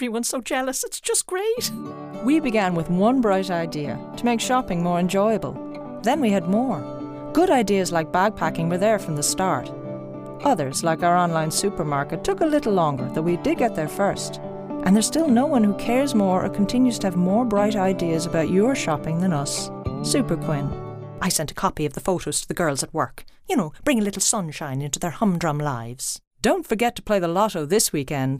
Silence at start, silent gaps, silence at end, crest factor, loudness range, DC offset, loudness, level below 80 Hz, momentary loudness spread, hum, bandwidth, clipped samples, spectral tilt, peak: 0 s; 26.27-26.31 s; 0 s; 20 dB; 3 LU; under 0.1%; -22 LUFS; -46 dBFS; 9 LU; none; 15.5 kHz; under 0.1%; -4.5 dB/octave; -2 dBFS